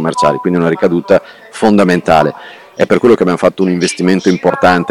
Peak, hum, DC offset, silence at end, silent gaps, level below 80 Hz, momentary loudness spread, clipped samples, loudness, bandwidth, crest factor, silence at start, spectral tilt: 0 dBFS; none; under 0.1%; 0 s; none; -44 dBFS; 7 LU; under 0.1%; -11 LUFS; 14 kHz; 12 dB; 0 s; -6 dB/octave